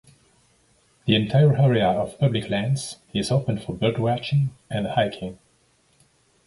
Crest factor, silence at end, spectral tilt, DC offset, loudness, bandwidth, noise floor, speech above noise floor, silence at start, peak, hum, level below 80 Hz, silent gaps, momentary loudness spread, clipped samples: 18 dB; 1.1 s; -6.5 dB/octave; under 0.1%; -23 LUFS; 11.5 kHz; -63 dBFS; 41 dB; 1.05 s; -4 dBFS; none; -52 dBFS; none; 11 LU; under 0.1%